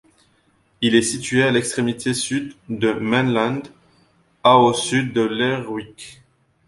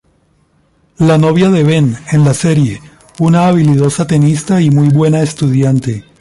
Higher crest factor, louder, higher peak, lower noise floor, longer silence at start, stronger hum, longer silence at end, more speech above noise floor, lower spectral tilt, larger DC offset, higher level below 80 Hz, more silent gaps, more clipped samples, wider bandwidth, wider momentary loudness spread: first, 18 dB vs 10 dB; second, -19 LUFS vs -11 LUFS; about the same, -2 dBFS vs 0 dBFS; first, -61 dBFS vs -54 dBFS; second, 0.8 s vs 1 s; neither; first, 0.55 s vs 0.2 s; about the same, 42 dB vs 44 dB; second, -4.5 dB/octave vs -7 dB/octave; neither; second, -56 dBFS vs -44 dBFS; neither; neither; about the same, 11.5 kHz vs 11.5 kHz; first, 15 LU vs 5 LU